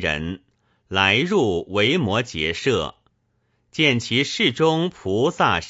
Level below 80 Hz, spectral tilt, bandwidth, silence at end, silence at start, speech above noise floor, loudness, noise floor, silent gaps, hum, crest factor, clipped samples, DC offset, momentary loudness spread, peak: -48 dBFS; -4.5 dB/octave; 8 kHz; 0 s; 0 s; 47 dB; -20 LUFS; -68 dBFS; none; none; 20 dB; under 0.1%; under 0.1%; 9 LU; -2 dBFS